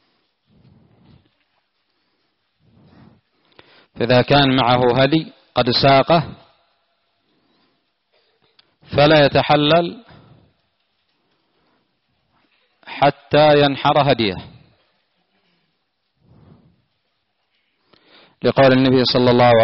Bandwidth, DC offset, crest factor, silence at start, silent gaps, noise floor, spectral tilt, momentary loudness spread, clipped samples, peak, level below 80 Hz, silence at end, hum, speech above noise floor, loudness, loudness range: 5.8 kHz; under 0.1%; 16 dB; 3.95 s; none; -71 dBFS; -4 dB/octave; 10 LU; under 0.1%; -2 dBFS; -50 dBFS; 0 s; none; 57 dB; -15 LUFS; 8 LU